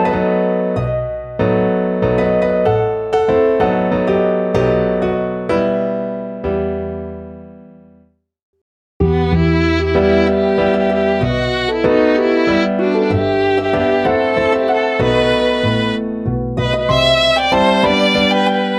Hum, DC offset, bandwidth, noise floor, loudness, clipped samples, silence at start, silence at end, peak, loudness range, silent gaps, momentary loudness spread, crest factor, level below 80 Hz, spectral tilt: none; under 0.1%; 11 kHz; -52 dBFS; -15 LUFS; under 0.1%; 0 s; 0 s; -2 dBFS; 6 LU; 8.43-8.53 s, 8.61-9.00 s; 7 LU; 14 dB; -34 dBFS; -6.5 dB/octave